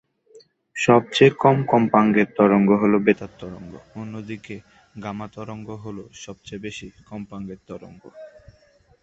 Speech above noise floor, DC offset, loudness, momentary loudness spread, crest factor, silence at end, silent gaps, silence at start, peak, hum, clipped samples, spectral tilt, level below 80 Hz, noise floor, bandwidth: 36 dB; under 0.1%; -18 LUFS; 22 LU; 20 dB; 0.75 s; none; 0.35 s; -2 dBFS; none; under 0.1%; -6.5 dB/octave; -58 dBFS; -57 dBFS; 8 kHz